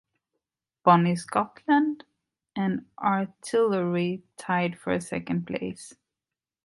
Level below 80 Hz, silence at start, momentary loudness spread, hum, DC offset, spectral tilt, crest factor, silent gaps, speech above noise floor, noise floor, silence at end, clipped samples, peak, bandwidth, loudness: -64 dBFS; 0.85 s; 15 LU; none; under 0.1%; -6.5 dB/octave; 24 dB; none; over 64 dB; under -90 dBFS; 0.75 s; under 0.1%; -4 dBFS; 11.5 kHz; -26 LUFS